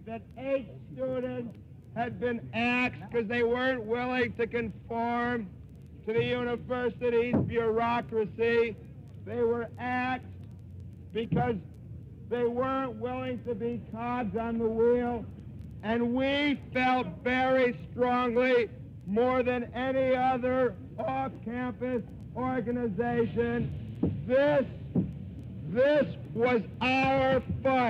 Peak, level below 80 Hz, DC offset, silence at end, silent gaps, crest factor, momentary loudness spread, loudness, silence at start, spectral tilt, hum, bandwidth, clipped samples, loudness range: -16 dBFS; -54 dBFS; under 0.1%; 0 s; none; 14 dB; 15 LU; -30 LUFS; 0 s; -8 dB/octave; none; 7.4 kHz; under 0.1%; 5 LU